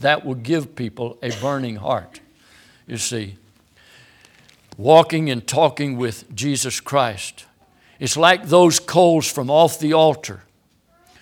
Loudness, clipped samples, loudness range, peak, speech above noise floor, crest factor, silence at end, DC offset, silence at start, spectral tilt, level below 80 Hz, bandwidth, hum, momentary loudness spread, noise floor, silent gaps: -18 LUFS; under 0.1%; 11 LU; 0 dBFS; 41 dB; 20 dB; 0.85 s; under 0.1%; 0 s; -4 dB/octave; -62 dBFS; 19 kHz; none; 15 LU; -59 dBFS; none